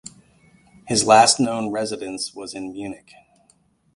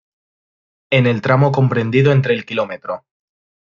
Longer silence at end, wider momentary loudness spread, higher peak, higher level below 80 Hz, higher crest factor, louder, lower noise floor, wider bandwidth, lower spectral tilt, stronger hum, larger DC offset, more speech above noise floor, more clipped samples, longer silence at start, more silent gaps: first, 1 s vs 0.7 s; first, 20 LU vs 12 LU; about the same, 0 dBFS vs -2 dBFS; about the same, -58 dBFS vs -56 dBFS; first, 22 dB vs 16 dB; second, -19 LUFS vs -16 LUFS; second, -61 dBFS vs under -90 dBFS; first, 11.5 kHz vs 7 kHz; second, -2.5 dB/octave vs -8 dB/octave; neither; neither; second, 41 dB vs over 75 dB; neither; about the same, 0.85 s vs 0.9 s; neither